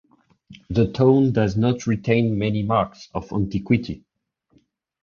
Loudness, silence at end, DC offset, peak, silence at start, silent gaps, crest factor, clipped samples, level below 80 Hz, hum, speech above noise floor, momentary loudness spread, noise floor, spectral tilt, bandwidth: -21 LUFS; 1.05 s; under 0.1%; -4 dBFS; 0.5 s; none; 18 dB; under 0.1%; -46 dBFS; none; 43 dB; 11 LU; -64 dBFS; -8 dB/octave; 7.2 kHz